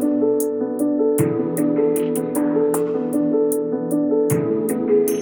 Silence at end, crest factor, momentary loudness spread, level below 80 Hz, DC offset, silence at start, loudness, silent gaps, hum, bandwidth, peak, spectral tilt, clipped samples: 0 s; 16 dB; 3 LU; -64 dBFS; under 0.1%; 0 s; -20 LUFS; none; none; over 20 kHz; -4 dBFS; -7 dB/octave; under 0.1%